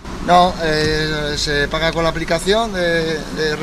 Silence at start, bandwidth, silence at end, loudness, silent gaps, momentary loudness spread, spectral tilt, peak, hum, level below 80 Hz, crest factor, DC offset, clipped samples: 0 s; 14.5 kHz; 0 s; -17 LUFS; none; 6 LU; -4 dB/octave; 0 dBFS; none; -32 dBFS; 16 dB; under 0.1%; under 0.1%